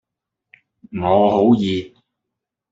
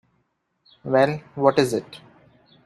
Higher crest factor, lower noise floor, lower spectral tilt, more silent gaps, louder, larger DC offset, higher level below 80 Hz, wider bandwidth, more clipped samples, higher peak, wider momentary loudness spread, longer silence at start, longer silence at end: about the same, 18 dB vs 22 dB; first, -82 dBFS vs -71 dBFS; first, -8 dB/octave vs -6 dB/octave; neither; first, -17 LUFS vs -21 LUFS; neither; first, -56 dBFS vs -64 dBFS; second, 7.8 kHz vs 13.5 kHz; neither; about the same, -2 dBFS vs -2 dBFS; second, 12 LU vs 17 LU; about the same, 0.9 s vs 0.85 s; first, 0.85 s vs 0.7 s